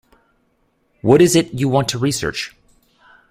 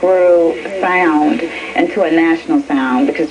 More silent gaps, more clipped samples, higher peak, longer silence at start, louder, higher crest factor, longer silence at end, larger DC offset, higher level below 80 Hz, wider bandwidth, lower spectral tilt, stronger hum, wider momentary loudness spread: neither; neither; about the same, 0 dBFS vs 0 dBFS; first, 1.05 s vs 0 s; second, -16 LUFS vs -13 LUFS; first, 18 dB vs 12 dB; first, 0.8 s vs 0 s; neither; about the same, -48 dBFS vs -52 dBFS; first, 16 kHz vs 10 kHz; about the same, -5 dB/octave vs -5.5 dB/octave; neither; first, 13 LU vs 6 LU